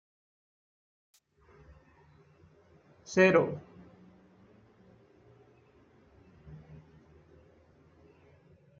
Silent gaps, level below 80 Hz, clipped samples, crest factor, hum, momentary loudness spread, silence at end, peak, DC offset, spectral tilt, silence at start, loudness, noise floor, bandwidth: none; -68 dBFS; under 0.1%; 28 dB; none; 32 LU; 2.25 s; -10 dBFS; under 0.1%; -5 dB/octave; 3.1 s; -27 LUFS; -62 dBFS; 7.4 kHz